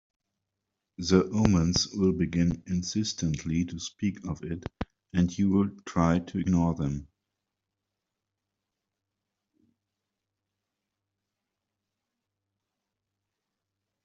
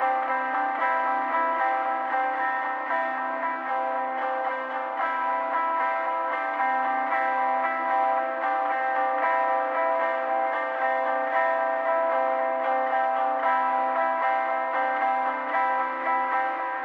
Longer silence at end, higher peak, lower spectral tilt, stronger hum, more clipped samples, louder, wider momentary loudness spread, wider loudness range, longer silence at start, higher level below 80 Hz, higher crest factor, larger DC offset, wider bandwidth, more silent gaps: first, 7 s vs 0 s; first, -6 dBFS vs -12 dBFS; first, -6 dB/octave vs -3.5 dB/octave; neither; neither; second, -28 LUFS vs -25 LUFS; first, 11 LU vs 4 LU; first, 7 LU vs 3 LU; first, 1 s vs 0 s; first, -52 dBFS vs under -90 dBFS; first, 26 dB vs 14 dB; neither; first, 7.8 kHz vs 5.8 kHz; neither